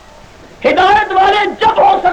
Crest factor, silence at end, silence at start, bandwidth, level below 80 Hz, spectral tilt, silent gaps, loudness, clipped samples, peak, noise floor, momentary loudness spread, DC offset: 10 dB; 0 s; 0.6 s; 9.4 kHz; -40 dBFS; -4 dB/octave; none; -10 LUFS; under 0.1%; -2 dBFS; -37 dBFS; 4 LU; under 0.1%